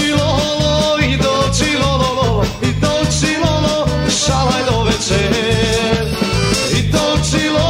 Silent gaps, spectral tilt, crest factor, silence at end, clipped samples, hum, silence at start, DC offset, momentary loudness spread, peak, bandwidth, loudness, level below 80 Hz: none; -4.5 dB/octave; 12 dB; 0 s; under 0.1%; none; 0 s; under 0.1%; 2 LU; -2 dBFS; 16 kHz; -14 LUFS; -26 dBFS